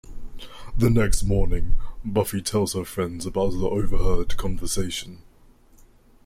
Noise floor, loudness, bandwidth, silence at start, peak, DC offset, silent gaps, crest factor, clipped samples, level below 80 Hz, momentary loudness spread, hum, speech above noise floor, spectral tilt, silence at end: -53 dBFS; -26 LUFS; 15.5 kHz; 0.1 s; -6 dBFS; under 0.1%; none; 14 dB; under 0.1%; -28 dBFS; 14 LU; none; 32 dB; -5.5 dB/octave; 1.1 s